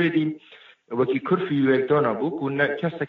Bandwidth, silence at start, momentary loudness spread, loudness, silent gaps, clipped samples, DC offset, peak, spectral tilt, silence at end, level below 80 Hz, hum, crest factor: 5 kHz; 0 s; 8 LU; -23 LUFS; none; under 0.1%; under 0.1%; -8 dBFS; -5.5 dB/octave; 0 s; -66 dBFS; none; 14 dB